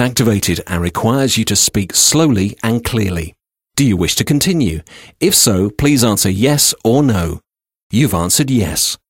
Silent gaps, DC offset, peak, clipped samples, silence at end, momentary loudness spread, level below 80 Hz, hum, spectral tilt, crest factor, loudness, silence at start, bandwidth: 7.83-7.90 s; 0.2%; 0 dBFS; under 0.1%; 0.15 s; 9 LU; -36 dBFS; none; -4 dB/octave; 14 dB; -13 LUFS; 0 s; 16.5 kHz